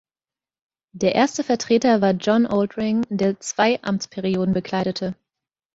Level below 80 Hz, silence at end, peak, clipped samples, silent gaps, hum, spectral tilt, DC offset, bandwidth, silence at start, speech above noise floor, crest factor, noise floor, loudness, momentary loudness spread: -58 dBFS; 0.6 s; -4 dBFS; under 0.1%; none; none; -5.5 dB/octave; under 0.1%; 8 kHz; 0.95 s; over 70 dB; 18 dB; under -90 dBFS; -21 LUFS; 7 LU